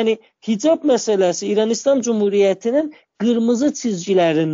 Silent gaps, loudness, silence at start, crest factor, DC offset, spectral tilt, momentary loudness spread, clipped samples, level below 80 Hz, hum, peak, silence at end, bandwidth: none; -18 LUFS; 0 s; 12 dB; under 0.1%; -5 dB/octave; 7 LU; under 0.1%; -68 dBFS; none; -6 dBFS; 0 s; 7.6 kHz